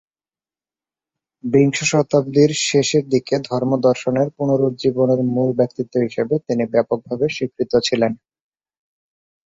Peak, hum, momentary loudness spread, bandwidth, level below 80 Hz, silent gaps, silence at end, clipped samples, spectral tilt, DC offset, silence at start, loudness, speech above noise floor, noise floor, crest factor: -2 dBFS; none; 6 LU; 8.4 kHz; -58 dBFS; none; 1.4 s; under 0.1%; -5.5 dB/octave; under 0.1%; 1.45 s; -18 LUFS; over 72 dB; under -90 dBFS; 16 dB